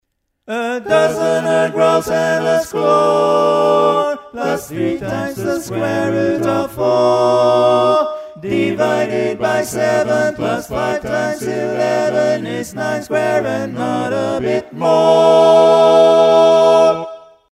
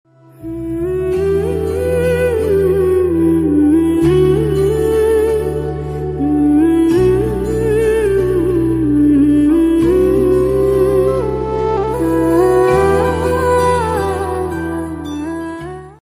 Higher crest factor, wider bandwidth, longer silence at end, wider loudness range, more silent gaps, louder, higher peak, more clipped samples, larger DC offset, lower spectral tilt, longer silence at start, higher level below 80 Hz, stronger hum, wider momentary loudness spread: about the same, 14 dB vs 12 dB; about the same, 15 kHz vs 15.5 kHz; first, 0.35 s vs 0.15 s; first, 7 LU vs 2 LU; neither; about the same, -14 LUFS vs -14 LUFS; about the same, 0 dBFS vs -2 dBFS; neither; neither; second, -5 dB/octave vs -7.5 dB/octave; about the same, 0.5 s vs 0.4 s; second, -52 dBFS vs -30 dBFS; neither; about the same, 11 LU vs 10 LU